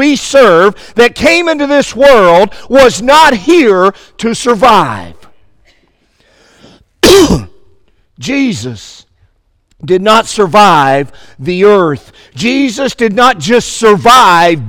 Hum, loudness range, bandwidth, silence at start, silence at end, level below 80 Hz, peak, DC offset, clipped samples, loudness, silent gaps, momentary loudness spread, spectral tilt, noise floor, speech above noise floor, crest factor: none; 6 LU; 18.5 kHz; 0 s; 0 s; -34 dBFS; 0 dBFS; under 0.1%; 2%; -7 LUFS; none; 12 LU; -4 dB/octave; -53 dBFS; 46 dB; 8 dB